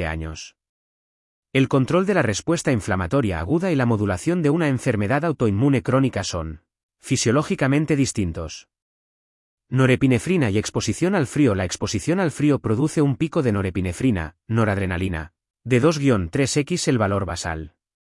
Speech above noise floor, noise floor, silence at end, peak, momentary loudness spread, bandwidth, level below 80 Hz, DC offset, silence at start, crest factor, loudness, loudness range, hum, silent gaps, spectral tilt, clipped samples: over 69 dB; under -90 dBFS; 0.45 s; -6 dBFS; 9 LU; 12 kHz; -48 dBFS; under 0.1%; 0 s; 16 dB; -21 LUFS; 2 LU; none; 0.69-1.43 s, 6.83-6.89 s, 8.82-9.58 s; -6 dB/octave; under 0.1%